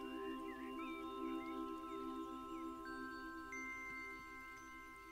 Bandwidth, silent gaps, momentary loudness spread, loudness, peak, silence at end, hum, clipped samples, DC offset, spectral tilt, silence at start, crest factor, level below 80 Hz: 16 kHz; none; 7 LU; -48 LUFS; -36 dBFS; 0 s; none; under 0.1%; under 0.1%; -4 dB/octave; 0 s; 14 dB; -70 dBFS